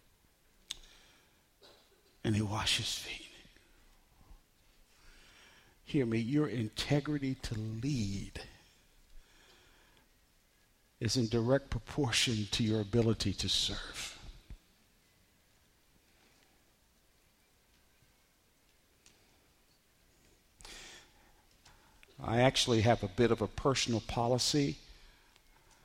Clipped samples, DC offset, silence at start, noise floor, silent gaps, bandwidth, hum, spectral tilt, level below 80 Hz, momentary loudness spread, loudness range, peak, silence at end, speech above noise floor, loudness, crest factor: under 0.1%; under 0.1%; 0.7 s; -70 dBFS; none; 16.5 kHz; none; -4.5 dB/octave; -56 dBFS; 19 LU; 12 LU; -14 dBFS; 0.8 s; 37 dB; -33 LUFS; 24 dB